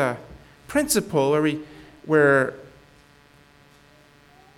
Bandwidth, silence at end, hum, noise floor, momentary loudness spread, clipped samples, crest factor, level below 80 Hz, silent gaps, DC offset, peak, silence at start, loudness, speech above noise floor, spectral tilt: 18 kHz; 1.9 s; none; -54 dBFS; 23 LU; under 0.1%; 20 dB; -56 dBFS; none; under 0.1%; -6 dBFS; 0 s; -21 LUFS; 33 dB; -4.5 dB/octave